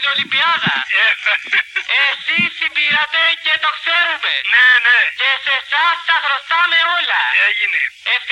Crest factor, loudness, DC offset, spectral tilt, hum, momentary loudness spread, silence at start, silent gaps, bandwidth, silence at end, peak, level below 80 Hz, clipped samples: 14 dB; -13 LUFS; under 0.1%; -2 dB/octave; none; 6 LU; 0 s; none; 11 kHz; 0 s; -2 dBFS; -66 dBFS; under 0.1%